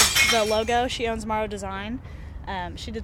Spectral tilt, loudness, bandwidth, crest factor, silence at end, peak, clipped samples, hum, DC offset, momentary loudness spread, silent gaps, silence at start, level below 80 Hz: -2 dB/octave; -24 LUFS; 18 kHz; 20 dB; 0 s; -6 dBFS; under 0.1%; none; under 0.1%; 17 LU; none; 0 s; -40 dBFS